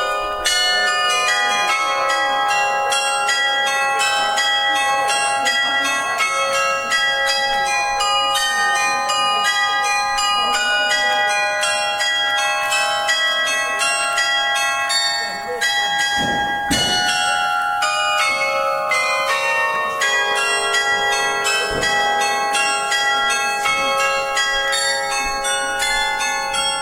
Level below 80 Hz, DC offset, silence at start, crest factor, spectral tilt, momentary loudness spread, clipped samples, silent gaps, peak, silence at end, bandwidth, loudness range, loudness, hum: -48 dBFS; under 0.1%; 0 s; 16 dB; 0 dB/octave; 2 LU; under 0.1%; none; -2 dBFS; 0 s; 16.5 kHz; 1 LU; -17 LUFS; none